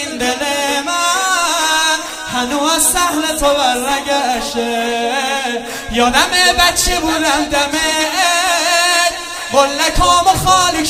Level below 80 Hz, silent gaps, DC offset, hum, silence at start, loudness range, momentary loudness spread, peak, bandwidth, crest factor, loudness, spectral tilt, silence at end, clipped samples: -32 dBFS; none; under 0.1%; none; 0 s; 2 LU; 7 LU; 0 dBFS; 16 kHz; 14 dB; -13 LUFS; -1.5 dB/octave; 0 s; under 0.1%